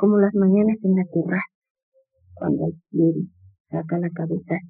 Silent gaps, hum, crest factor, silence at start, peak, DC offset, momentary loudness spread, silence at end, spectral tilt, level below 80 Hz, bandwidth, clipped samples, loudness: 1.55-1.62 s, 1.70-1.75 s, 1.83-1.92 s, 3.60-3.65 s; none; 16 dB; 0 s; -6 dBFS; under 0.1%; 13 LU; 0 s; -12 dB/octave; -66 dBFS; 2.7 kHz; under 0.1%; -22 LUFS